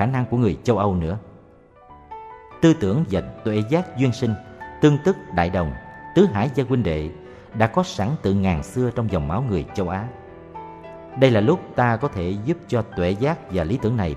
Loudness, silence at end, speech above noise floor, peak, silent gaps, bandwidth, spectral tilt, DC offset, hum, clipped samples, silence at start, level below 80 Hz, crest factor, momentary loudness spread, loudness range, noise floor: -22 LUFS; 0 s; 29 dB; -2 dBFS; none; 11.5 kHz; -7.5 dB/octave; under 0.1%; none; under 0.1%; 0 s; -42 dBFS; 20 dB; 19 LU; 2 LU; -49 dBFS